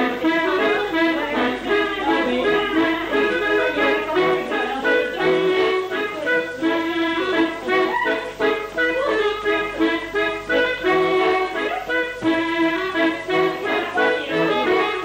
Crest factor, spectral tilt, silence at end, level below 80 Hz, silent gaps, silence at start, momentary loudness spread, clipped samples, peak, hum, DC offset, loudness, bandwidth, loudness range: 14 dB; -4.5 dB/octave; 0 s; -50 dBFS; none; 0 s; 3 LU; under 0.1%; -6 dBFS; none; under 0.1%; -20 LUFS; 16 kHz; 1 LU